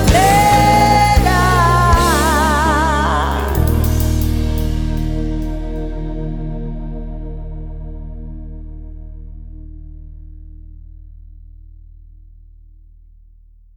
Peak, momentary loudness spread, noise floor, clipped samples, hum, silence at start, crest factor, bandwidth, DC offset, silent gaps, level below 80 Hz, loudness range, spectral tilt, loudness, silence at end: -2 dBFS; 25 LU; -44 dBFS; under 0.1%; none; 0 s; 16 dB; 19 kHz; under 0.1%; none; -22 dBFS; 23 LU; -5 dB/octave; -15 LUFS; 1.8 s